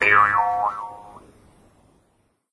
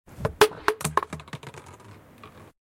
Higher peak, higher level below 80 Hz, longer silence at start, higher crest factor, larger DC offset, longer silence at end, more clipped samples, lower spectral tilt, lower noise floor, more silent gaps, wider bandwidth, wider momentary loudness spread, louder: about the same, -4 dBFS vs -2 dBFS; second, -58 dBFS vs -52 dBFS; second, 0 s vs 0.15 s; second, 20 dB vs 28 dB; neither; first, 1.35 s vs 0.35 s; neither; about the same, -4 dB/octave vs -3.5 dB/octave; first, -66 dBFS vs -49 dBFS; neither; second, 11 kHz vs 16.5 kHz; second, 22 LU vs 25 LU; first, -19 LUFS vs -25 LUFS